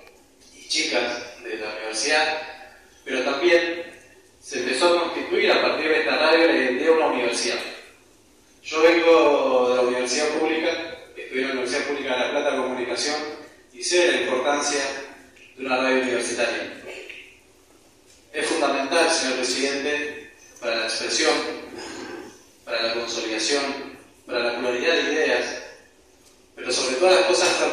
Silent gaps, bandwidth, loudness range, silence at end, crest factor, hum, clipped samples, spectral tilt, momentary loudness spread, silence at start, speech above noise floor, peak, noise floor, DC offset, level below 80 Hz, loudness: none; 14 kHz; 6 LU; 0 s; 18 dB; none; under 0.1%; -1.5 dB/octave; 17 LU; 0.55 s; 33 dB; -4 dBFS; -55 dBFS; under 0.1%; -64 dBFS; -22 LUFS